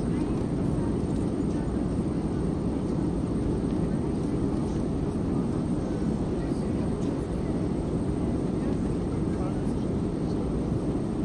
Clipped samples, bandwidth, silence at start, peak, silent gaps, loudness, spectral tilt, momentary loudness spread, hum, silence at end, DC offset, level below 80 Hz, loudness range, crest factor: under 0.1%; 11 kHz; 0 s; -14 dBFS; none; -29 LUFS; -8.5 dB/octave; 1 LU; none; 0 s; under 0.1%; -38 dBFS; 0 LU; 12 dB